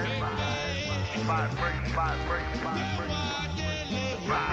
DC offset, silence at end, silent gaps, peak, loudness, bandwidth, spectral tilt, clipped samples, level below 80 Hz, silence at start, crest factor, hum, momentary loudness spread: under 0.1%; 0 s; none; -16 dBFS; -30 LUFS; 8.2 kHz; -5 dB/octave; under 0.1%; -40 dBFS; 0 s; 12 dB; none; 3 LU